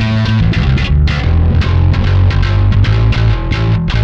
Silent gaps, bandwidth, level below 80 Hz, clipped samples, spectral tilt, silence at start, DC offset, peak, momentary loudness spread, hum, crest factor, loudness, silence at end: none; 7 kHz; -16 dBFS; under 0.1%; -7.5 dB/octave; 0 s; under 0.1%; 0 dBFS; 2 LU; none; 10 dB; -12 LUFS; 0 s